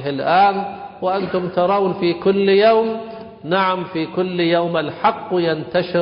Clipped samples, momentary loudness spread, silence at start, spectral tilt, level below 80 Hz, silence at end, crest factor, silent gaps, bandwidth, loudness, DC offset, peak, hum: under 0.1%; 10 LU; 0 s; -11 dB/octave; -56 dBFS; 0 s; 14 dB; none; 5.4 kHz; -18 LUFS; under 0.1%; -4 dBFS; none